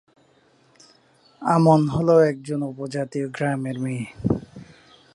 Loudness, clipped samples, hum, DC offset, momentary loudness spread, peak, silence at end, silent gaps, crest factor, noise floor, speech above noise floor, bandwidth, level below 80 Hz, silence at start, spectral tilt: -22 LUFS; under 0.1%; none; under 0.1%; 12 LU; -4 dBFS; 0.5 s; none; 20 dB; -59 dBFS; 38 dB; 11.5 kHz; -52 dBFS; 1.4 s; -8 dB/octave